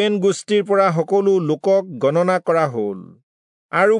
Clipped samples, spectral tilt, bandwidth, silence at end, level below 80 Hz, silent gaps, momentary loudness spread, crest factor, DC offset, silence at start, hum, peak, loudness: under 0.1%; -6 dB/octave; 10.5 kHz; 0 s; -74 dBFS; 3.23-3.69 s; 7 LU; 14 dB; under 0.1%; 0 s; none; -4 dBFS; -18 LUFS